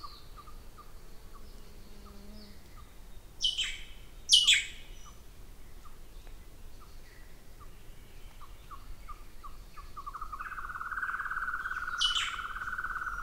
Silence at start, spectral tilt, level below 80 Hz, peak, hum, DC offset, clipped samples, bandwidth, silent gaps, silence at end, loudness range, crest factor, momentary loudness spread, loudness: 0 s; 1 dB/octave; -48 dBFS; -10 dBFS; none; under 0.1%; under 0.1%; 16 kHz; none; 0 s; 24 LU; 28 dB; 28 LU; -29 LUFS